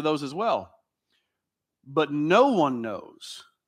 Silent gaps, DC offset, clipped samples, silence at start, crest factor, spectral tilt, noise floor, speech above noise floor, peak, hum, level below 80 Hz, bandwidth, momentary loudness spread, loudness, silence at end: none; under 0.1%; under 0.1%; 0 s; 20 dB; -6 dB/octave; -85 dBFS; 60 dB; -6 dBFS; none; -78 dBFS; 12.5 kHz; 20 LU; -24 LUFS; 0.25 s